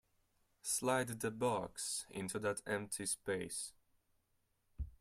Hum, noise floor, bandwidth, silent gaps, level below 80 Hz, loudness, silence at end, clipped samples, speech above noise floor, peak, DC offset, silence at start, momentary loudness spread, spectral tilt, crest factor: none; -80 dBFS; 16 kHz; none; -60 dBFS; -40 LUFS; 0.1 s; under 0.1%; 40 dB; -22 dBFS; under 0.1%; 0.65 s; 9 LU; -3.5 dB/octave; 20 dB